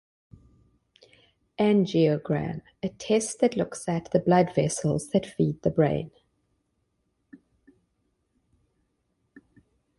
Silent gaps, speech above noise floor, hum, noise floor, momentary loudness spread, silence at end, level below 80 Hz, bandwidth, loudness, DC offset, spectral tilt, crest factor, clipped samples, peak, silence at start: none; 50 dB; none; -75 dBFS; 13 LU; 3.9 s; -58 dBFS; 11.5 kHz; -26 LUFS; under 0.1%; -6 dB/octave; 20 dB; under 0.1%; -8 dBFS; 1.6 s